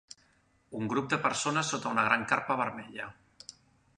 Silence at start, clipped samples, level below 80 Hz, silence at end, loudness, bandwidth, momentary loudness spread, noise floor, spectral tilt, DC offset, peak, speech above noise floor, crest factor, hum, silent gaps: 0.7 s; under 0.1%; -70 dBFS; 0.85 s; -30 LUFS; 11 kHz; 22 LU; -68 dBFS; -3.5 dB/octave; under 0.1%; -8 dBFS; 37 dB; 24 dB; none; none